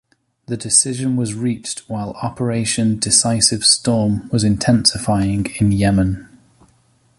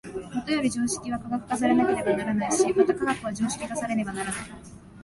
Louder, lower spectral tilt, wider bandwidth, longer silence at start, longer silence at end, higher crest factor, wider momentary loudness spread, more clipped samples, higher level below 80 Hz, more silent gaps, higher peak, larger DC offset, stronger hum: first, -16 LUFS vs -26 LUFS; about the same, -4 dB/octave vs -4.5 dB/octave; about the same, 11.5 kHz vs 11.5 kHz; first, 0.5 s vs 0.05 s; first, 0.95 s vs 0 s; about the same, 18 dB vs 18 dB; about the same, 12 LU vs 10 LU; neither; first, -40 dBFS vs -54 dBFS; neither; first, 0 dBFS vs -8 dBFS; neither; neither